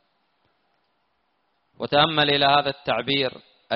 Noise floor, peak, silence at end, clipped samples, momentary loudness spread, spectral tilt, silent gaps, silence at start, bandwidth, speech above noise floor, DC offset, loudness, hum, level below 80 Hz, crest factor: -71 dBFS; -6 dBFS; 0 s; under 0.1%; 9 LU; -1.5 dB/octave; none; 1.8 s; 5.6 kHz; 50 dB; under 0.1%; -21 LUFS; none; -60 dBFS; 20 dB